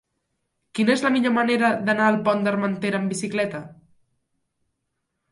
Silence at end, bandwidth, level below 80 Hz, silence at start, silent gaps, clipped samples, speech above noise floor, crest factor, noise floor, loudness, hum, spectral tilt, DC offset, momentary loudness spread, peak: 1.6 s; 11.5 kHz; -68 dBFS; 0.75 s; none; under 0.1%; 56 dB; 18 dB; -78 dBFS; -22 LUFS; none; -5.5 dB/octave; under 0.1%; 7 LU; -6 dBFS